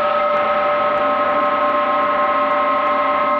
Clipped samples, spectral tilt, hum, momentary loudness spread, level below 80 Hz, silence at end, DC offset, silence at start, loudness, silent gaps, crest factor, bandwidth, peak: under 0.1%; -6 dB/octave; none; 0 LU; -54 dBFS; 0 s; under 0.1%; 0 s; -16 LUFS; none; 10 dB; 6 kHz; -6 dBFS